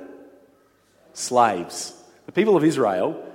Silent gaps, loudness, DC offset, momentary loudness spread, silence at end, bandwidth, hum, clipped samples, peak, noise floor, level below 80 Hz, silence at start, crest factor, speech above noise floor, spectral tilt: none; -21 LUFS; under 0.1%; 14 LU; 0 s; 16.5 kHz; none; under 0.1%; -2 dBFS; -59 dBFS; -72 dBFS; 0 s; 20 dB; 39 dB; -5 dB/octave